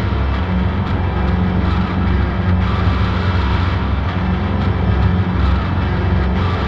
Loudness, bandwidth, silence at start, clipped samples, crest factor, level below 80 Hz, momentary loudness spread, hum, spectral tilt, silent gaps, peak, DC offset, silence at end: -17 LUFS; 6 kHz; 0 s; under 0.1%; 12 dB; -20 dBFS; 3 LU; none; -8.5 dB/octave; none; -4 dBFS; under 0.1%; 0 s